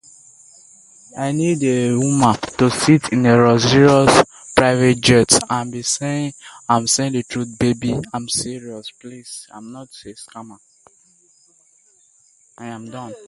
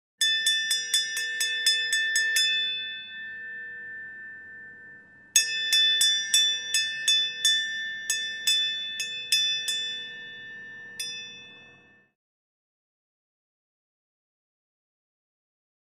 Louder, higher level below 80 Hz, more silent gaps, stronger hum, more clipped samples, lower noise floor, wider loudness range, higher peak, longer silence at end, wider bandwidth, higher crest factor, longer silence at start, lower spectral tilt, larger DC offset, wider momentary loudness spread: first, -16 LUFS vs -23 LUFS; first, -48 dBFS vs -82 dBFS; neither; neither; neither; about the same, -56 dBFS vs -56 dBFS; about the same, 15 LU vs 17 LU; first, 0 dBFS vs -4 dBFS; second, 0.1 s vs 4.3 s; second, 11.5 kHz vs 15.5 kHz; second, 18 dB vs 24 dB; first, 1.15 s vs 0.2 s; first, -4.5 dB/octave vs 3.5 dB/octave; neither; first, 24 LU vs 19 LU